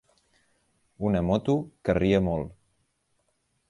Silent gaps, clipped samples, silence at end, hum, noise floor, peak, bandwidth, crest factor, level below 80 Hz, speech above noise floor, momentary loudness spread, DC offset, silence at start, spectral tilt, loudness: none; under 0.1%; 1.2 s; none; -73 dBFS; -10 dBFS; 10.5 kHz; 20 dB; -46 dBFS; 48 dB; 9 LU; under 0.1%; 1 s; -8 dB/octave; -26 LUFS